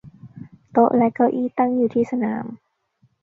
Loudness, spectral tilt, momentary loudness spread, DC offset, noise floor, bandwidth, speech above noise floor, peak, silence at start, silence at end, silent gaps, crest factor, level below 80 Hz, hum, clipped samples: -20 LUFS; -9.5 dB/octave; 9 LU; under 0.1%; -63 dBFS; 3.6 kHz; 44 dB; -4 dBFS; 0.05 s; 0.65 s; none; 18 dB; -64 dBFS; none; under 0.1%